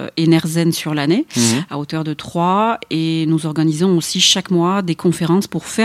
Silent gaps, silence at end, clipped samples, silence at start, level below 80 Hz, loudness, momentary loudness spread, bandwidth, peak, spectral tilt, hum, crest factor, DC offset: none; 0 s; under 0.1%; 0 s; -56 dBFS; -16 LUFS; 9 LU; 15.5 kHz; 0 dBFS; -4.5 dB/octave; none; 16 dB; under 0.1%